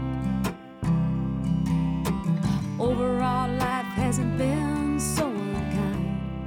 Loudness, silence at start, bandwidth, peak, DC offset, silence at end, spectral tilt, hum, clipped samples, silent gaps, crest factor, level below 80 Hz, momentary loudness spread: -26 LUFS; 0 s; 17 kHz; -12 dBFS; under 0.1%; 0 s; -6.5 dB/octave; none; under 0.1%; none; 12 dB; -40 dBFS; 3 LU